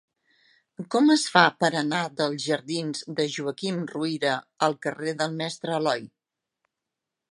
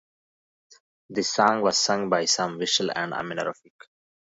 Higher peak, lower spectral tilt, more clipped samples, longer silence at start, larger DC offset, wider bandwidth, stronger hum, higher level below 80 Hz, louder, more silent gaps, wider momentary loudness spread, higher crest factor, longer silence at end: about the same, -2 dBFS vs -4 dBFS; first, -4 dB/octave vs -2.5 dB/octave; neither; second, 0.8 s vs 1.1 s; neither; first, 11.5 kHz vs 8 kHz; neither; second, -76 dBFS vs -70 dBFS; about the same, -25 LUFS vs -24 LUFS; neither; about the same, 11 LU vs 9 LU; about the same, 24 dB vs 22 dB; first, 1.25 s vs 0.8 s